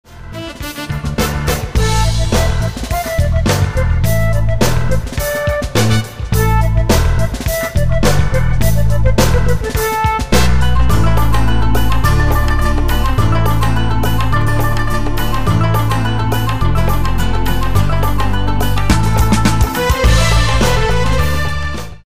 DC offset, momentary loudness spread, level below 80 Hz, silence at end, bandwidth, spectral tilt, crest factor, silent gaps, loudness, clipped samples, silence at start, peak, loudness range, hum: 10%; 5 LU; -18 dBFS; 0 s; 16 kHz; -5.5 dB/octave; 12 dB; none; -15 LUFS; under 0.1%; 0.05 s; -2 dBFS; 2 LU; none